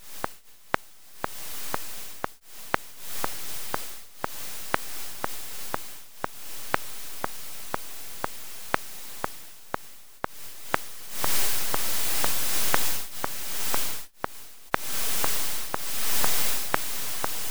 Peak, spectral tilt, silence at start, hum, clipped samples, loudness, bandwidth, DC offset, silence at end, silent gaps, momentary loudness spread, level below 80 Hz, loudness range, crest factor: 0 dBFS; -1.5 dB/octave; 0 s; none; under 0.1%; -30 LUFS; over 20 kHz; 2%; 0 s; none; 13 LU; -54 dBFS; 8 LU; 28 dB